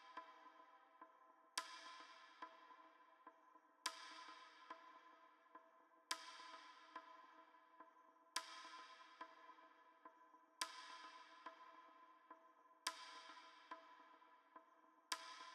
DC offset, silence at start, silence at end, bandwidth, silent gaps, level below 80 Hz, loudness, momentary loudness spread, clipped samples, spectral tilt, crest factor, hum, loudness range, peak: under 0.1%; 0 s; 0 s; 12.5 kHz; none; under -90 dBFS; -55 LUFS; 17 LU; under 0.1%; 2.5 dB/octave; 34 dB; none; 3 LU; -24 dBFS